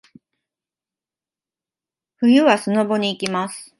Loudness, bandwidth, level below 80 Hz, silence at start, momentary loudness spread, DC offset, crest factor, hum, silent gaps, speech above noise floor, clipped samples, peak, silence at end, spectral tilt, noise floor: -18 LUFS; 11.5 kHz; -70 dBFS; 2.2 s; 9 LU; under 0.1%; 20 dB; none; none; over 72 dB; under 0.1%; 0 dBFS; 0.15 s; -5 dB/octave; under -90 dBFS